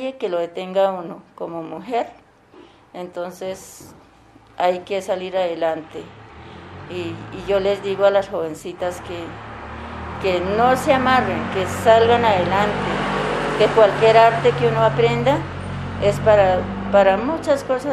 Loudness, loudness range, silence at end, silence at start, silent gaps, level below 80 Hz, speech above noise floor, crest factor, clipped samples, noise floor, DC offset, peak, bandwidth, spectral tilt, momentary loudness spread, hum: -19 LUFS; 11 LU; 0 s; 0 s; none; -46 dBFS; 30 dB; 18 dB; under 0.1%; -49 dBFS; under 0.1%; -2 dBFS; 14 kHz; -5.5 dB/octave; 18 LU; none